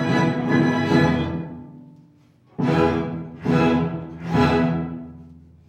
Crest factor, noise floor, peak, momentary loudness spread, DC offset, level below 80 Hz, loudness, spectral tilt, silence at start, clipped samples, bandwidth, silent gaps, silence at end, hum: 18 dB; -54 dBFS; -4 dBFS; 16 LU; under 0.1%; -48 dBFS; -21 LUFS; -7.5 dB/octave; 0 s; under 0.1%; 8.6 kHz; none; 0.3 s; none